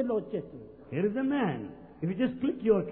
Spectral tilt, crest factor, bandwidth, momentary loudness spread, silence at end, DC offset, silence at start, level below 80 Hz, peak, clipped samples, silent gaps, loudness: -11 dB/octave; 18 dB; 4.1 kHz; 14 LU; 0 s; under 0.1%; 0 s; -62 dBFS; -12 dBFS; under 0.1%; none; -31 LUFS